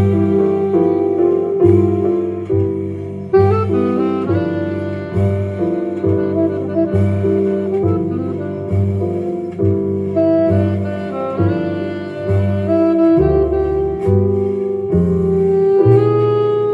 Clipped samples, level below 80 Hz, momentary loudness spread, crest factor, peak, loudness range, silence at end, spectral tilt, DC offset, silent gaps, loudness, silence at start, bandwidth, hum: under 0.1%; -40 dBFS; 9 LU; 14 dB; 0 dBFS; 3 LU; 0 s; -10.5 dB/octave; under 0.1%; none; -16 LUFS; 0 s; 5 kHz; none